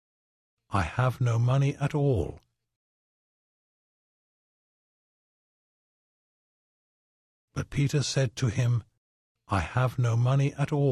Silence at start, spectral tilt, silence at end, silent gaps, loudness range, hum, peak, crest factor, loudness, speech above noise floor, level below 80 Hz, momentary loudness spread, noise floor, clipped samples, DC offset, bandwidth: 0.7 s; -6.5 dB/octave; 0 s; 2.76-7.48 s, 8.98-9.35 s; 9 LU; none; -12 dBFS; 18 dB; -27 LUFS; over 64 dB; -48 dBFS; 7 LU; under -90 dBFS; under 0.1%; under 0.1%; 12.5 kHz